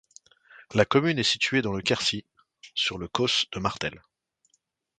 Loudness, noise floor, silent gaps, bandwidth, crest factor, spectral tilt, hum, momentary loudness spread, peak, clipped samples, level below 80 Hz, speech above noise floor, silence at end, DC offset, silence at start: -25 LUFS; -72 dBFS; none; 9.4 kHz; 24 dB; -4 dB/octave; none; 10 LU; -4 dBFS; under 0.1%; -56 dBFS; 46 dB; 1 s; under 0.1%; 0.55 s